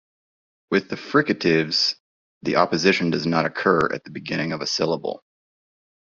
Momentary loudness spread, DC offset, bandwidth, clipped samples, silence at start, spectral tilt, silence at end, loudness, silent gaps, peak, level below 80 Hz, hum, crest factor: 11 LU; under 0.1%; 7.6 kHz; under 0.1%; 0.7 s; -4.5 dB/octave; 0.85 s; -22 LUFS; 2.00-2.41 s; -2 dBFS; -60 dBFS; none; 22 dB